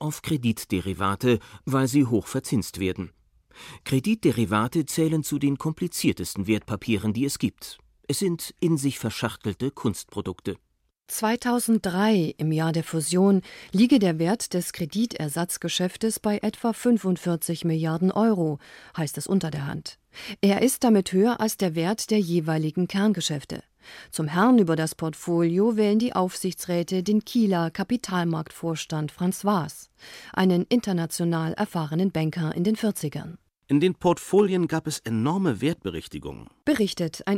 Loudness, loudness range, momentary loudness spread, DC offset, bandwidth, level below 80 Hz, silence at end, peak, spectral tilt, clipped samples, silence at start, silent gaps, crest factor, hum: -25 LUFS; 4 LU; 11 LU; under 0.1%; 16.5 kHz; -58 dBFS; 0 s; -10 dBFS; -5.5 dB/octave; under 0.1%; 0 s; none; 16 dB; none